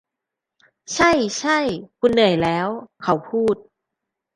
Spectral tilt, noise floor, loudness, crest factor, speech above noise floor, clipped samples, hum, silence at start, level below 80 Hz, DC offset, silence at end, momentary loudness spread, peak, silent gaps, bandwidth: -4.5 dB/octave; -84 dBFS; -20 LUFS; 20 dB; 65 dB; under 0.1%; none; 0.9 s; -52 dBFS; under 0.1%; 0.75 s; 11 LU; -2 dBFS; none; 11 kHz